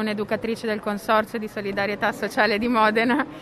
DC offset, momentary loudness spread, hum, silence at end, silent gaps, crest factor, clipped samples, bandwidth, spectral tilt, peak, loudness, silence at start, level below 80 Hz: under 0.1%; 8 LU; none; 0 s; none; 16 dB; under 0.1%; 14 kHz; -5 dB/octave; -6 dBFS; -23 LUFS; 0 s; -56 dBFS